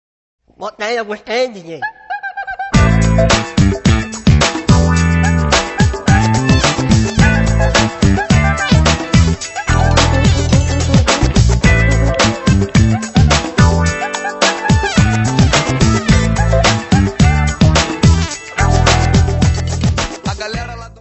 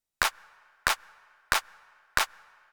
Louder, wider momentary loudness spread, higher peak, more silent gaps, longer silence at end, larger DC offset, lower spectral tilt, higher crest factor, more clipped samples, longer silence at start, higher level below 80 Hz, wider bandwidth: first, -13 LUFS vs -29 LUFS; first, 9 LU vs 3 LU; first, 0 dBFS vs -4 dBFS; neither; second, 0.15 s vs 0.45 s; neither; first, -5 dB/octave vs 0 dB/octave; second, 12 dB vs 28 dB; neither; first, 0.6 s vs 0.2 s; first, -20 dBFS vs -52 dBFS; second, 8.4 kHz vs over 20 kHz